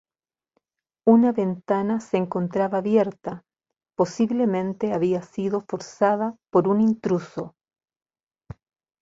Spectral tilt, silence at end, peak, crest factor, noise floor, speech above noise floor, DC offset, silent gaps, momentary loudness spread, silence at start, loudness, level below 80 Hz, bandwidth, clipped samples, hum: -7.5 dB/octave; 1.55 s; -4 dBFS; 20 dB; under -90 dBFS; over 68 dB; under 0.1%; none; 15 LU; 1.05 s; -23 LUFS; -62 dBFS; 7.8 kHz; under 0.1%; none